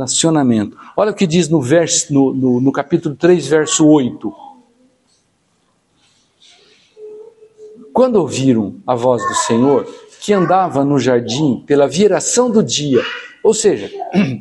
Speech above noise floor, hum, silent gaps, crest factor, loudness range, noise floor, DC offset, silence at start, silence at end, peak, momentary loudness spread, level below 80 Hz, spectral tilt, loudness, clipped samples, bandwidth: 47 dB; none; none; 14 dB; 6 LU; -61 dBFS; under 0.1%; 0 s; 0 s; 0 dBFS; 7 LU; -56 dBFS; -4.5 dB/octave; -14 LUFS; under 0.1%; 11.5 kHz